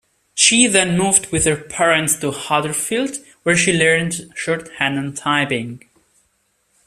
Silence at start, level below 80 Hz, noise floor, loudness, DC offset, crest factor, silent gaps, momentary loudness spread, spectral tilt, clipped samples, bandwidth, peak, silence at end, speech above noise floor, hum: 0.35 s; -50 dBFS; -65 dBFS; -16 LUFS; under 0.1%; 18 dB; none; 11 LU; -2.5 dB/octave; under 0.1%; 14.5 kHz; 0 dBFS; 1.1 s; 47 dB; none